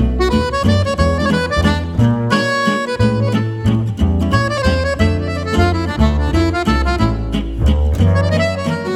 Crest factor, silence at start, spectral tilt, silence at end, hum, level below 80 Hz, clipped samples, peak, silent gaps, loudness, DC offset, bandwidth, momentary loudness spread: 14 dB; 0 s; -6.5 dB/octave; 0 s; none; -22 dBFS; under 0.1%; 0 dBFS; none; -16 LUFS; under 0.1%; 12.5 kHz; 3 LU